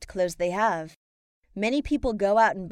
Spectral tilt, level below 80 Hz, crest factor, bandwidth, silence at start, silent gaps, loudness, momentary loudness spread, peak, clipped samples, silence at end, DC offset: -5 dB/octave; -46 dBFS; 16 dB; 14 kHz; 0 s; 0.96-1.43 s; -25 LUFS; 12 LU; -10 dBFS; under 0.1%; 0 s; under 0.1%